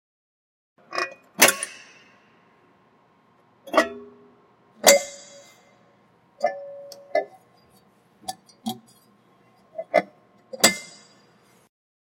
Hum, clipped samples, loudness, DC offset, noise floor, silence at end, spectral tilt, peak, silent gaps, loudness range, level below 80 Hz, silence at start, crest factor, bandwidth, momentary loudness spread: none; under 0.1%; -22 LUFS; under 0.1%; -60 dBFS; 1.15 s; -0.5 dB/octave; 0 dBFS; none; 10 LU; -74 dBFS; 0.9 s; 28 dB; 16.5 kHz; 26 LU